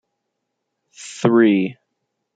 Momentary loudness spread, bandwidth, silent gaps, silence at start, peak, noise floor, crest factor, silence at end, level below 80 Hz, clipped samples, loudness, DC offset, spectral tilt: 21 LU; 9.2 kHz; none; 1 s; -2 dBFS; -77 dBFS; 18 dB; 0.65 s; -72 dBFS; under 0.1%; -17 LUFS; under 0.1%; -6 dB/octave